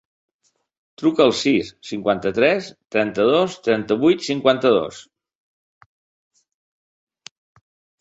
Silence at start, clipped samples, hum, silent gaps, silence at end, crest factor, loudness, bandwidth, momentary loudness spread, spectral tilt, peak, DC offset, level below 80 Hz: 1 s; under 0.1%; none; none; 3 s; 20 dB; -19 LUFS; 8 kHz; 8 LU; -5 dB/octave; -2 dBFS; under 0.1%; -60 dBFS